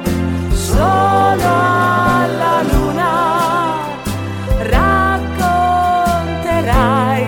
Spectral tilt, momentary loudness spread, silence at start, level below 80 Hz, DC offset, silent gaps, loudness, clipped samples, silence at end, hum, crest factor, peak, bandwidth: -6 dB/octave; 7 LU; 0 s; -24 dBFS; 0.2%; none; -14 LUFS; under 0.1%; 0 s; none; 12 dB; -2 dBFS; 18 kHz